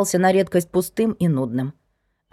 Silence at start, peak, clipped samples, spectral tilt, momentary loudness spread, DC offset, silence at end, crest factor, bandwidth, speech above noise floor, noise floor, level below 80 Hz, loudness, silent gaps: 0 s; -6 dBFS; under 0.1%; -6 dB/octave; 9 LU; under 0.1%; 0.6 s; 14 dB; 16 kHz; 50 dB; -70 dBFS; -56 dBFS; -21 LUFS; none